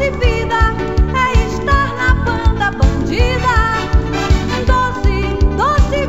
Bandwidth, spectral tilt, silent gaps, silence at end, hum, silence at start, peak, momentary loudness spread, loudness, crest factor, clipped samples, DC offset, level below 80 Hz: 8 kHz; -6 dB/octave; none; 0 s; none; 0 s; 0 dBFS; 3 LU; -15 LUFS; 14 dB; under 0.1%; 2%; -16 dBFS